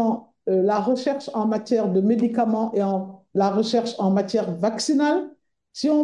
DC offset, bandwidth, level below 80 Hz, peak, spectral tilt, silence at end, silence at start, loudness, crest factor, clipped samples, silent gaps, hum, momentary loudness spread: under 0.1%; 11.5 kHz; -70 dBFS; -8 dBFS; -6 dB/octave; 0 s; 0 s; -22 LUFS; 14 dB; under 0.1%; none; none; 6 LU